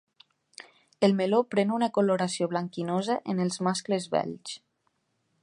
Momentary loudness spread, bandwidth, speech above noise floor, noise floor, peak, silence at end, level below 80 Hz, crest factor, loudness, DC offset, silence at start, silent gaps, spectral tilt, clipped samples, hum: 16 LU; 11 kHz; 48 dB; -75 dBFS; -8 dBFS; 0.85 s; -76 dBFS; 20 dB; -27 LUFS; under 0.1%; 1 s; none; -5.5 dB/octave; under 0.1%; none